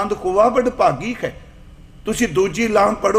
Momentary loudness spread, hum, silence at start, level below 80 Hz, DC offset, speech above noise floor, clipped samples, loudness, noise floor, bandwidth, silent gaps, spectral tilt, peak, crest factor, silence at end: 11 LU; none; 0 s; -42 dBFS; under 0.1%; 24 dB; under 0.1%; -18 LUFS; -41 dBFS; 16 kHz; none; -5 dB/octave; -2 dBFS; 16 dB; 0 s